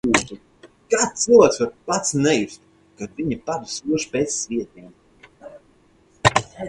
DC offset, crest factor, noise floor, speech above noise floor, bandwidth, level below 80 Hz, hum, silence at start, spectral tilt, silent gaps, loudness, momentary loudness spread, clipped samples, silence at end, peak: under 0.1%; 22 dB; -56 dBFS; 36 dB; 11.5 kHz; -50 dBFS; none; 0.05 s; -3.5 dB/octave; none; -20 LUFS; 19 LU; under 0.1%; 0 s; 0 dBFS